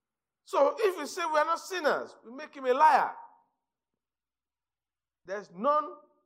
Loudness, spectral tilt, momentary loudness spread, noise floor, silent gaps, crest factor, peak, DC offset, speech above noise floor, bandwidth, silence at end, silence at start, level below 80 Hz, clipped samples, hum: -28 LUFS; -3 dB/octave; 20 LU; under -90 dBFS; none; 20 dB; -10 dBFS; under 0.1%; over 62 dB; 16 kHz; 0.3 s; 0.5 s; -90 dBFS; under 0.1%; none